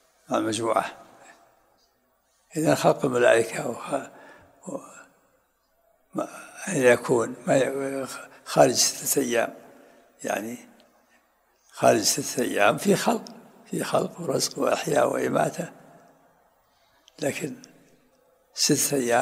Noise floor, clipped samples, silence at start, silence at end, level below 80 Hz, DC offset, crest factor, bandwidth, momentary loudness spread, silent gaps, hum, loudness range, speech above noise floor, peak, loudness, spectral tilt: -68 dBFS; under 0.1%; 0.3 s; 0 s; -70 dBFS; under 0.1%; 24 dB; 16 kHz; 17 LU; none; none; 6 LU; 44 dB; -2 dBFS; -24 LUFS; -3.5 dB/octave